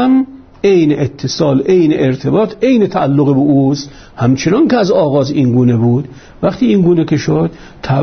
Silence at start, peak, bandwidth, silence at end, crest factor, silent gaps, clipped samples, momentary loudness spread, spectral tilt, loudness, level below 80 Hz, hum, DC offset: 0 s; 0 dBFS; 6.6 kHz; 0 s; 10 dB; none; under 0.1%; 7 LU; -7.5 dB/octave; -12 LUFS; -44 dBFS; none; under 0.1%